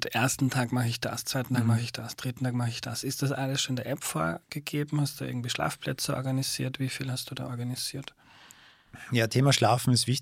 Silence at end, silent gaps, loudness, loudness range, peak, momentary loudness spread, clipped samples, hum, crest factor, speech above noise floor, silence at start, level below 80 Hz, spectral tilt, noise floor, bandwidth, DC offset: 0 s; none; -29 LUFS; 3 LU; -10 dBFS; 11 LU; under 0.1%; none; 20 dB; 26 dB; 0 s; -62 dBFS; -4.5 dB/octave; -55 dBFS; 16.5 kHz; under 0.1%